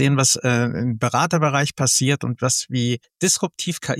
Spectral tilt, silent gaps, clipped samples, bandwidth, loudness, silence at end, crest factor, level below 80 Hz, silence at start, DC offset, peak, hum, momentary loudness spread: -4 dB/octave; none; under 0.1%; 15.5 kHz; -19 LUFS; 0 s; 16 dB; -58 dBFS; 0 s; under 0.1%; -4 dBFS; none; 6 LU